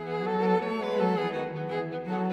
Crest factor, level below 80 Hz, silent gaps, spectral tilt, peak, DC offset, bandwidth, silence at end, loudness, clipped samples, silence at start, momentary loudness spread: 16 dB; -68 dBFS; none; -7.5 dB/octave; -12 dBFS; under 0.1%; 8.4 kHz; 0 s; -29 LUFS; under 0.1%; 0 s; 7 LU